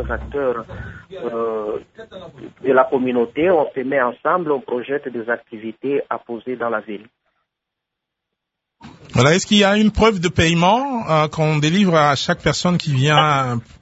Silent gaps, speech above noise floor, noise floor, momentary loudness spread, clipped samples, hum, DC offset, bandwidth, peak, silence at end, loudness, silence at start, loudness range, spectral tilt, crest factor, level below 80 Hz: none; 63 dB; -81 dBFS; 16 LU; under 0.1%; none; under 0.1%; 8 kHz; 0 dBFS; 0.2 s; -18 LUFS; 0 s; 11 LU; -5.5 dB/octave; 18 dB; -40 dBFS